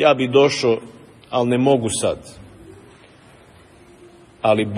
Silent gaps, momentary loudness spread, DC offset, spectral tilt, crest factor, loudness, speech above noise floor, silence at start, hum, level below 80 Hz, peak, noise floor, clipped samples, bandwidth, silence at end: none; 10 LU; under 0.1%; -5 dB/octave; 18 dB; -18 LUFS; 30 dB; 0 s; none; -56 dBFS; -2 dBFS; -47 dBFS; under 0.1%; 11.5 kHz; 0 s